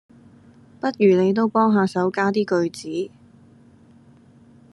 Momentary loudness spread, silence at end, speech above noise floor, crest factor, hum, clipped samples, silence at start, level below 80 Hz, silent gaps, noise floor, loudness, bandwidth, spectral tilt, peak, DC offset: 12 LU; 1.65 s; 31 dB; 18 dB; none; under 0.1%; 0.85 s; -68 dBFS; none; -51 dBFS; -20 LUFS; 11.5 kHz; -7 dB/octave; -4 dBFS; under 0.1%